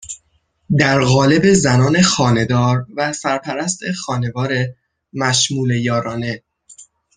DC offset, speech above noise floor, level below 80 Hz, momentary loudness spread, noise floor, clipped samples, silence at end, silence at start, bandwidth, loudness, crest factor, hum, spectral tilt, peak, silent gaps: under 0.1%; 47 dB; -48 dBFS; 12 LU; -62 dBFS; under 0.1%; 0.35 s; 0 s; 10 kHz; -16 LUFS; 16 dB; none; -4.5 dB/octave; 0 dBFS; none